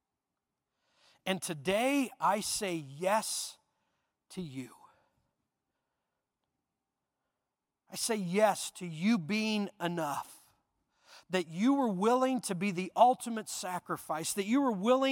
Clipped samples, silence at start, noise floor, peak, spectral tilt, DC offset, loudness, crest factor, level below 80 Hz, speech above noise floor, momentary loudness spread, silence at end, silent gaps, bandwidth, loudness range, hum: under 0.1%; 1.25 s; -88 dBFS; -12 dBFS; -4 dB/octave; under 0.1%; -32 LUFS; 22 dB; -76 dBFS; 57 dB; 14 LU; 0 s; none; 17.5 kHz; 15 LU; none